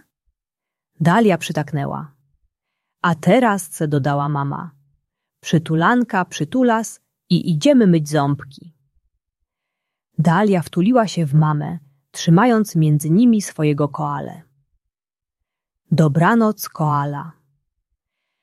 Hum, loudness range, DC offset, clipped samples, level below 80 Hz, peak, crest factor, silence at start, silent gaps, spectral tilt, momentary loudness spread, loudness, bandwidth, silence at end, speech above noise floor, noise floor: none; 4 LU; under 0.1%; under 0.1%; -60 dBFS; -2 dBFS; 16 dB; 1 s; none; -6.5 dB/octave; 13 LU; -18 LUFS; 13.5 kHz; 1.1 s; over 73 dB; under -90 dBFS